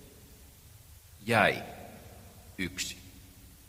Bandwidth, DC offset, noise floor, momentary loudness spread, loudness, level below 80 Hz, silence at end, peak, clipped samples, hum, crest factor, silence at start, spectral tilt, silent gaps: 16 kHz; under 0.1%; -54 dBFS; 28 LU; -30 LUFS; -58 dBFS; 0.2 s; -8 dBFS; under 0.1%; none; 28 dB; 0 s; -4 dB/octave; none